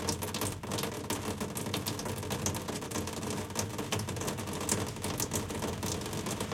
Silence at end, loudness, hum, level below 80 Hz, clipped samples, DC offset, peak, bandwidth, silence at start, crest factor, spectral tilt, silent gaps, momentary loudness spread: 0 s; -35 LUFS; none; -56 dBFS; under 0.1%; under 0.1%; -14 dBFS; 17 kHz; 0 s; 22 dB; -3.5 dB/octave; none; 3 LU